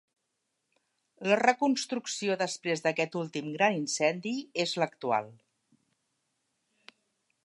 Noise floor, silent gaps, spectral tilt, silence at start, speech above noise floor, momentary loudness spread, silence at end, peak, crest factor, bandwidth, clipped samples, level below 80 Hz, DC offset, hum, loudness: -81 dBFS; none; -3.5 dB/octave; 1.2 s; 52 dB; 9 LU; 2.1 s; -8 dBFS; 24 dB; 11.5 kHz; under 0.1%; -84 dBFS; under 0.1%; none; -30 LUFS